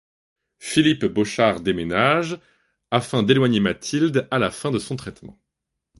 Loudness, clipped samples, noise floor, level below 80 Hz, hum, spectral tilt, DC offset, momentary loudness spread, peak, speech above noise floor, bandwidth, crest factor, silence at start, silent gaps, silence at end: -21 LUFS; under 0.1%; -81 dBFS; -52 dBFS; none; -5.5 dB/octave; under 0.1%; 13 LU; -2 dBFS; 61 dB; 11.5 kHz; 20 dB; 0.6 s; none; 0.7 s